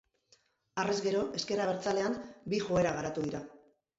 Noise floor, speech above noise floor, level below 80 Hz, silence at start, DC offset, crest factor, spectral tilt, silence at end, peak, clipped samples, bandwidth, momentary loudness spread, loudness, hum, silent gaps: -69 dBFS; 37 dB; -64 dBFS; 0.75 s; under 0.1%; 16 dB; -5 dB/octave; 0.4 s; -18 dBFS; under 0.1%; 8 kHz; 10 LU; -33 LUFS; none; none